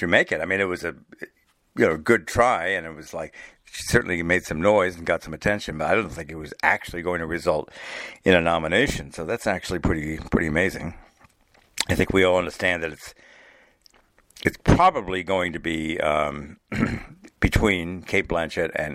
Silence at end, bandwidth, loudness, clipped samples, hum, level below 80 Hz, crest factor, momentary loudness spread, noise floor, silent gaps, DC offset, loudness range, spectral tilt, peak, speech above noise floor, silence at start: 0 s; 16 kHz; -23 LUFS; under 0.1%; none; -40 dBFS; 22 dB; 16 LU; -60 dBFS; none; under 0.1%; 2 LU; -5 dB/octave; -2 dBFS; 36 dB; 0 s